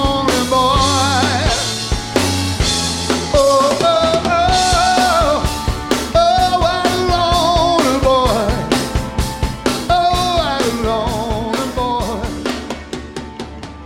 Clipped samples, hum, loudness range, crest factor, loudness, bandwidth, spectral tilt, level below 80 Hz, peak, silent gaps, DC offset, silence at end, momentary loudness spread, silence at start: under 0.1%; none; 4 LU; 14 dB; -15 LUFS; 16.5 kHz; -4 dB/octave; -26 dBFS; 0 dBFS; none; under 0.1%; 0 s; 9 LU; 0 s